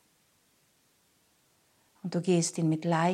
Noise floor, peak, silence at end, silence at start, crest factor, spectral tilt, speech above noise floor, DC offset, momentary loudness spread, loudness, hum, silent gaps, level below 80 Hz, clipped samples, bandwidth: -69 dBFS; -14 dBFS; 0 s; 2.05 s; 18 dB; -5.5 dB/octave; 42 dB; under 0.1%; 9 LU; -29 LUFS; none; none; -80 dBFS; under 0.1%; 13 kHz